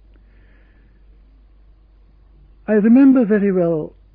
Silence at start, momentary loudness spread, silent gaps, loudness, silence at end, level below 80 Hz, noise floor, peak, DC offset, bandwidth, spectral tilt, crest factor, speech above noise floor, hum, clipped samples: 2.7 s; 12 LU; none; -14 LUFS; 0.25 s; -48 dBFS; -49 dBFS; -4 dBFS; under 0.1%; 3 kHz; -13 dB/octave; 14 dB; 36 dB; none; under 0.1%